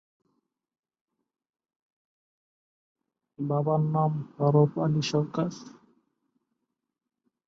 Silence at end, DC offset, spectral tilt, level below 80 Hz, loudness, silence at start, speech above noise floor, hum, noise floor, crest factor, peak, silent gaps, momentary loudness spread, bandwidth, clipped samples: 1.8 s; under 0.1%; -7.5 dB/octave; -70 dBFS; -27 LUFS; 3.4 s; 61 dB; none; -86 dBFS; 20 dB; -10 dBFS; none; 10 LU; 7.4 kHz; under 0.1%